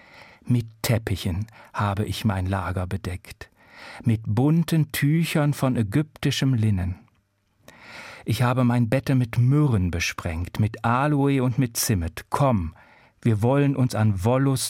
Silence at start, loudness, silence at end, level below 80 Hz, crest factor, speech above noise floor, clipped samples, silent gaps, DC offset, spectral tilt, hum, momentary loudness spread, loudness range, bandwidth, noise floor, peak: 0.45 s; -23 LUFS; 0 s; -50 dBFS; 16 dB; 44 dB; under 0.1%; none; under 0.1%; -6 dB/octave; none; 11 LU; 4 LU; 16.5 kHz; -67 dBFS; -8 dBFS